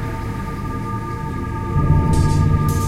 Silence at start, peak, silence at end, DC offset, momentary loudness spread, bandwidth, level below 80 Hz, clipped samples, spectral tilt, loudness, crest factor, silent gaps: 0 s; -4 dBFS; 0 s; under 0.1%; 10 LU; 15 kHz; -26 dBFS; under 0.1%; -7.5 dB/octave; -20 LUFS; 16 dB; none